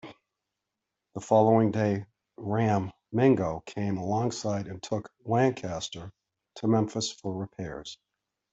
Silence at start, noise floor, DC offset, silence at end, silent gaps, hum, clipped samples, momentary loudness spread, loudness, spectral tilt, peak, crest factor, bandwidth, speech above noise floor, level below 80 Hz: 0.05 s; -86 dBFS; under 0.1%; 0.6 s; none; none; under 0.1%; 15 LU; -28 LUFS; -6.5 dB/octave; -10 dBFS; 20 dB; 8 kHz; 59 dB; -62 dBFS